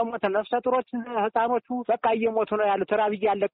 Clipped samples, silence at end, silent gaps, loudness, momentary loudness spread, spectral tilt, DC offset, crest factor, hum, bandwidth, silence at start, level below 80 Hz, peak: under 0.1%; 0.05 s; none; -25 LUFS; 4 LU; -3.5 dB/octave; under 0.1%; 14 dB; none; 4.2 kHz; 0 s; -66 dBFS; -12 dBFS